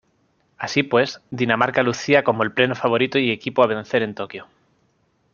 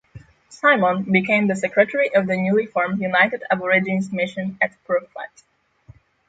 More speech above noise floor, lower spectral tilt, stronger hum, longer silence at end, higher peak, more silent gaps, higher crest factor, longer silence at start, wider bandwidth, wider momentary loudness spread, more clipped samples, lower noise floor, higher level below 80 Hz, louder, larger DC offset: first, 45 dB vs 30 dB; second, -5 dB/octave vs -6.5 dB/octave; neither; second, 0.9 s vs 1.05 s; about the same, -2 dBFS vs -2 dBFS; neither; about the same, 20 dB vs 18 dB; first, 0.6 s vs 0.15 s; second, 7.2 kHz vs 9.2 kHz; first, 10 LU vs 7 LU; neither; first, -65 dBFS vs -50 dBFS; about the same, -62 dBFS vs -62 dBFS; about the same, -20 LUFS vs -19 LUFS; neither